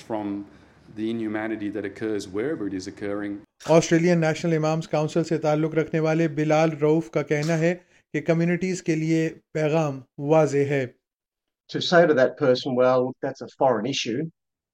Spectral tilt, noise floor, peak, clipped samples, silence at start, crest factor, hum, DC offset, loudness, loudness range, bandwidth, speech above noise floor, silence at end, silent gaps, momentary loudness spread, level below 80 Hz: -6 dB/octave; -86 dBFS; -4 dBFS; under 0.1%; 0.1 s; 18 dB; none; under 0.1%; -24 LUFS; 3 LU; 10.5 kHz; 63 dB; 0.45 s; 11.14-11.18 s; 12 LU; -64 dBFS